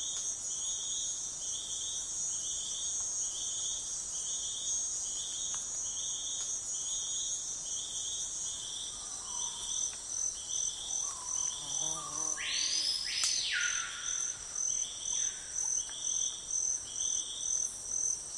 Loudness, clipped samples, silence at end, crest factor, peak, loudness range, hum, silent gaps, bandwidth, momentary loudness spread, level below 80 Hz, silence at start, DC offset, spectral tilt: -33 LUFS; under 0.1%; 0 s; 24 dB; -12 dBFS; 3 LU; none; none; 11.5 kHz; 5 LU; -64 dBFS; 0 s; under 0.1%; 2 dB/octave